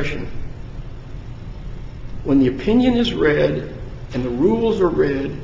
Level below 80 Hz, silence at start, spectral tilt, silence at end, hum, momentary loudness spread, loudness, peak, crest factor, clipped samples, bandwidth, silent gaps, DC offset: -34 dBFS; 0 s; -7.5 dB/octave; 0 s; none; 19 LU; -18 LUFS; -4 dBFS; 16 dB; under 0.1%; 7.6 kHz; none; under 0.1%